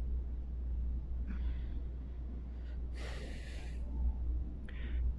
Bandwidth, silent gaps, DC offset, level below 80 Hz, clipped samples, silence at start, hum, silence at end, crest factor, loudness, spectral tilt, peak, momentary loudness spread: 7.8 kHz; none; under 0.1%; -38 dBFS; under 0.1%; 0 s; none; 0 s; 14 dB; -42 LUFS; -7.5 dB/octave; -24 dBFS; 6 LU